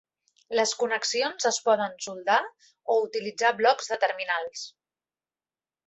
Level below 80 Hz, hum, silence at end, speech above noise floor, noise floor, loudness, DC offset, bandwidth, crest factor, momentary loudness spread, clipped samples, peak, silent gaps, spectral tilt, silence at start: -76 dBFS; none; 1.15 s; over 64 dB; under -90 dBFS; -26 LUFS; under 0.1%; 8.4 kHz; 20 dB; 11 LU; under 0.1%; -8 dBFS; none; -1 dB/octave; 0.5 s